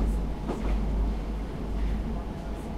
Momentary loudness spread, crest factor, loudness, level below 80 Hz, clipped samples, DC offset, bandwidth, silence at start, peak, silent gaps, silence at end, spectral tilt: 5 LU; 14 dB; -32 LUFS; -30 dBFS; under 0.1%; under 0.1%; 9.6 kHz; 0 s; -14 dBFS; none; 0 s; -7.5 dB/octave